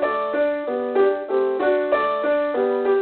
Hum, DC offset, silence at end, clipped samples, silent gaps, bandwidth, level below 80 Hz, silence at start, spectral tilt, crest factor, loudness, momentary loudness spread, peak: none; under 0.1%; 0 s; under 0.1%; none; 4.4 kHz; -62 dBFS; 0 s; -9 dB/octave; 12 dB; -21 LUFS; 3 LU; -8 dBFS